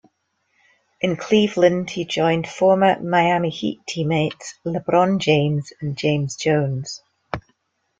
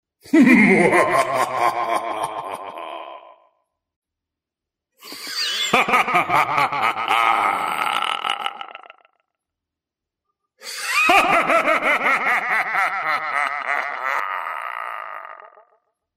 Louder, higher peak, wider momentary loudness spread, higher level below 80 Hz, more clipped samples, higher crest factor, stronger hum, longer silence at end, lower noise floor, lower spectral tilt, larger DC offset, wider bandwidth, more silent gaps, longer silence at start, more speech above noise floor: about the same, -20 LUFS vs -18 LUFS; about the same, -2 dBFS vs -2 dBFS; second, 13 LU vs 18 LU; about the same, -58 dBFS vs -60 dBFS; neither; about the same, 18 dB vs 20 dB; neither; about the same, 0.6 s vs 0.7 s; second, -70 dBFS vs -86 dBFS; first, -6 dB/octave vs -3.5 dB/octave; neither; second, 9.2 kHz vs 16 kHz; second, none vs 3.96-4.02 s; first, 1.05 s vs 0.25 s; second, 50 dB vs 71 dB